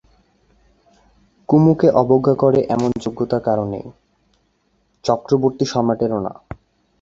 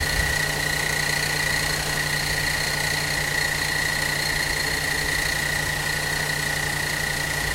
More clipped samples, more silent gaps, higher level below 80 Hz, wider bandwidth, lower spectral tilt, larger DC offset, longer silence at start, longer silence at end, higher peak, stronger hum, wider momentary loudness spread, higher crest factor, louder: neither; neither; second, -50 dBFS vs -38 dBFS; second, 7.8 kHz vs 16 kHz; first, -8 dB/octave vs -2 dB/octave; neither; first, 1.5 s vs 0 s; first, 0.45 s vs 0 s; first, -2 dBFS vs -10 dBFS; neither; first, 20 LU vs 2 LU; about the same, 18 dB vs 14 dB; first, -17 LUFS vs -22 LUFS